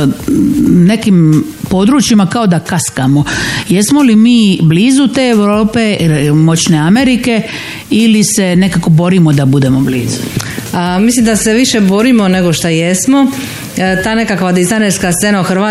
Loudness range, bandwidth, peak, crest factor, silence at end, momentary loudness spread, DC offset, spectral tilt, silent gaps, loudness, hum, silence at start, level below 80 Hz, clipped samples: 2 LU; 16 kHz; 0 dBFS; 8 dB; 0 s; 6 LU; under 0.1%; -5 dB/octave; none; -9 LUFS; none; 0 s; -36 dBFS; under 0.1%